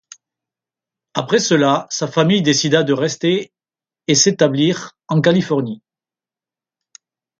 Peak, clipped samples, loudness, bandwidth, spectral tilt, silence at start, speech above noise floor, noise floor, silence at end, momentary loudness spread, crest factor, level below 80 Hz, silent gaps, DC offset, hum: 0 dBFS; under 0.1%; -16 LUFS; 10 kHz; -4 dB/octave; 1.15 s; over 74 dB; under -90 dBFS; 1.65 s; 12 LU; 18 dB; -60 dBFS; none; under 0.1%; none